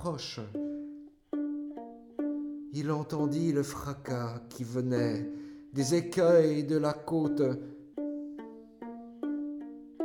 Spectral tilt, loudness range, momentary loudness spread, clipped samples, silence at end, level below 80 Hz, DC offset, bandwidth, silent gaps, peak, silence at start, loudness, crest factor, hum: -6.5 dB/octave; 6 LU; 17 LU; under 0.1%; 0 s; -64 dBFS; under 0.1%; 17 kHz; none; -12 dBFS; 0 s; -32 LUFS; 20 dB; none